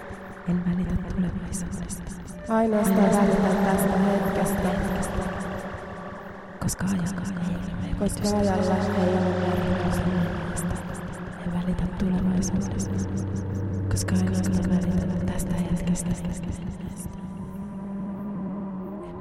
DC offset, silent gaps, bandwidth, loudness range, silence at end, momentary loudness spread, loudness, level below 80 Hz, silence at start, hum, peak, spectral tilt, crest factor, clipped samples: 0.1%; none; 15.5 kHz; 7 LU; 0 s; 13 LU; -26 LUFS; -38 dBFS; 0 s; none; -8 dBFS; -6.5 dB/octave; 16 dB; under 0.1%